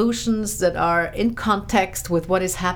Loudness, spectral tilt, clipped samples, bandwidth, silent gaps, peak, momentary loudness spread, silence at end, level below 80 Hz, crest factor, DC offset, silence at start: -21 LUFS; -4.5 dB/octave; under 0.1%; over 20 kHz; none; -6 dBFS; 3 LU; 0 s; -40 dBFS; 16 dB; under 0.1%; 0 s